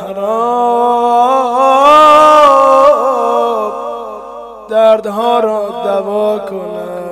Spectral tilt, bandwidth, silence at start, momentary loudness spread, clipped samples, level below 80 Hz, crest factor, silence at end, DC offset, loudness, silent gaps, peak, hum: -4 dB/octave; 15 kHz; 0 s; 17 LU; 0.8%; -50 dBFS; 10 dB; 0 s; under 0.1%; -9 LUFS; none; 0 dBFS; none